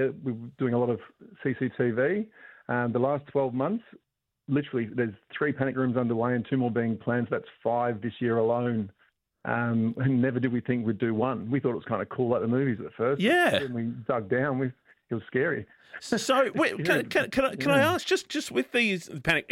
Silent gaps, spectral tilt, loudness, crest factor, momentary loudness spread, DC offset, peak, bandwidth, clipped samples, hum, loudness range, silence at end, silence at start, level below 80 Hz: none; -6 dB/octave; -27 LUFS; 18 dB; 8 LU; under 0.1%; -10 dBFS; 16 kHz; under 0.1%; none; 3 LU; 0 s; 0 s; -62 dBFS